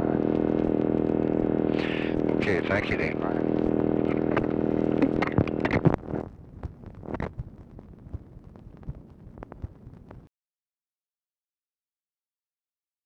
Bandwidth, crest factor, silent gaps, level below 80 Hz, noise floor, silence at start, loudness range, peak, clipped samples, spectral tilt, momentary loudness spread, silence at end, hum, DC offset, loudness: 6.8 kHz; 22 dB; none; -46 dBFS; under -90 dBFS; 0 s; 20 LU; -6 dBFS; under 0.1%; -8.5 dB/octave; 19 LU; 2.85 s; none; under 0.1%; -26 LUFS